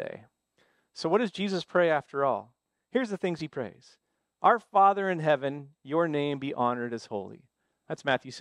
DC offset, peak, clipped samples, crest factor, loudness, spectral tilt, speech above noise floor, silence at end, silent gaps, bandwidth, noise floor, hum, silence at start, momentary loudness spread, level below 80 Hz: under 0.1%; -8 dBFS; under 0.1%; 20 dB; -28 LUFS; -6 dB/octave; 42 dB; 0 s; none; 10.5 kHz; -70 dBFS; none; 0 s; 16 LU; -78 dBFS